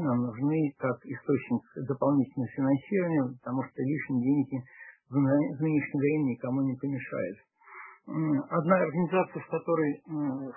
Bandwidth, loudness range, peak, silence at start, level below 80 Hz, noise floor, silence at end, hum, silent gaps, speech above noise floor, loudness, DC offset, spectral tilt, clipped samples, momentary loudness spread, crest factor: 3.2 kHz; 1 LU; -10 dBFS; 0 s; -72 dBFS; -50 dBFS; 0 s; none; none; 21 dB; -30 LUFS; under 0.1%; -12.5 dB/octave; under 0.1%; 10 LU; 20 dB